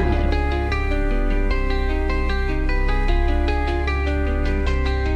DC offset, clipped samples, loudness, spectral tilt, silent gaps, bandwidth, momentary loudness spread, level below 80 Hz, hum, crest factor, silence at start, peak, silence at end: 0.2%; under 0.1%; -23 LUFS; -7.5 dB/octave; none; 7 kHz; 2 LU; -20 dBFS; none; 12 dB; 0 s; -8 dBFS; 0 s